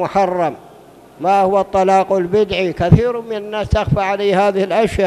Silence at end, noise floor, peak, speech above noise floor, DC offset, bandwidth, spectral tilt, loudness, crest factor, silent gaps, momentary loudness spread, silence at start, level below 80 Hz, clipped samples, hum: 0 s; -42 dBFS; 0 dBFS; 27 dB; under 0.1%; 13.5 kHz; -7 dB/octave; -16 LUFS; 16 dB; none; 8 LU; 0 s; -34 dBFS; 0.2%; none